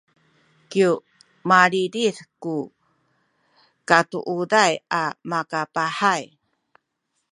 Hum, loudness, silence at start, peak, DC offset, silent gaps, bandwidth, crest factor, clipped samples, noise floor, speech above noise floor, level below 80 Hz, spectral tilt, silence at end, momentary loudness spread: none; -21 LUFS; 0.7 s; 0 dBFS; under 0.1%; none; 11 kHz; 24 dB; under 0.1%; -75 dBFS; 54 dB; -72 dBFS; -4 dB/octave; 1.1 s; 13 LU